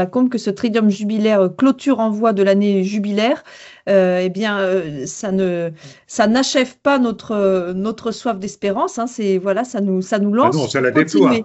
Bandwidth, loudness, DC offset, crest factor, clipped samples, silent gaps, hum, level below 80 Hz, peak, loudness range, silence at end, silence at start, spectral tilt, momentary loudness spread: 8.4 kHz; -17 LUFS; under 0.1%; 16 dB; under 0.1%; none; none; -58 dBFS; 0 dBFS; 3 LU; 0 s; 0 s; -5.5 dB/octave; 8 LU